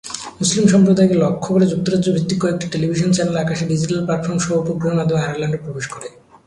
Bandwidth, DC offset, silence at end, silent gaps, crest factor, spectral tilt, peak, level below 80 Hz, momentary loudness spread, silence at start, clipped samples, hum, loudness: 11.5 kHz; under 0.1%; 0.4 s; none; 16 dB; -6 dB/octave; -2 dBFS; -50 dBFS; 12 LU; 0.05 s; under 0.1%; none; -17 LUFS